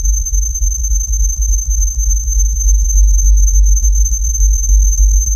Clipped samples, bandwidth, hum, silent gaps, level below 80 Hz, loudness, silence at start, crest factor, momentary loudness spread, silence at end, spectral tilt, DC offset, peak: under 0.1%; 13.5 kHz; none; none; -10 dBFS; -14 LUFS; 0 s; 10 dB; 4 LU; 0 s; -3.5 dB/octave; under 0.1%; -2 dBFS